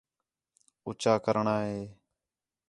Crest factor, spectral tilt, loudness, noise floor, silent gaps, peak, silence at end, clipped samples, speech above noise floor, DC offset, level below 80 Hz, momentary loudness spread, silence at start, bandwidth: 22 dB; -6 dB/octave; -29 LUFS; under -90 dBFS; none; -10 dBFS; 0.75 s; under 0.1%; over 61 dB; under 0.1%; -68 dBFS; 17 LU; 0.85 s; 11.5 kHz